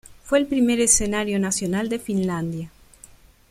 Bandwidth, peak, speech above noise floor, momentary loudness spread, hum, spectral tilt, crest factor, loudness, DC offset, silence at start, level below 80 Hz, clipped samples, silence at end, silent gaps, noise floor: 15.5 kHz; -4 dBFS; 28 dB; 12 LU; none; -4 dB/octave; 20 dB; -21 LUFS; under 0.1%; 0.05 s; -44 dBFS; under 0.1%; 0.8 s; none; -49 dBFS